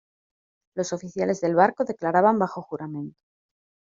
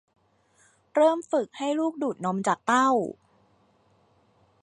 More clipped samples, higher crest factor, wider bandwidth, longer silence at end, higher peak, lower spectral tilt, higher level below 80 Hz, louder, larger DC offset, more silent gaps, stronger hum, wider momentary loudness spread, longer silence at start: neither; about the same, 22 dB vs 18 dB; second, 7.6 kHz vs 11 kHz; second, 0.85 s vs 1.5 s; first, -4 dBFS vs -10 dBFS; about the same, -6 dB/octave vs -5 dB/octave; first, -70 dBFS vs -76 dBFS; about the same, -24 LUFS vs -25 LUFS; neither; neither; neither; first, 15 LU vs 8 LU; second, 0.75 s vs 0.95 s